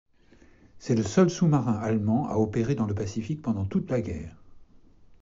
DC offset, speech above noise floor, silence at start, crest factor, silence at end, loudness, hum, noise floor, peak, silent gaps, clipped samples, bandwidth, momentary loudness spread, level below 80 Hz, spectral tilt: under 0.1%; 31 dB; 0.75 s; 18 dB; 0.05 s; -26 LUFS; none; -56 dBFS; -10 dBFS; none; under 0.1%; 7.8 kHz; 11 LU; -52 dBFS; -8 dB/octave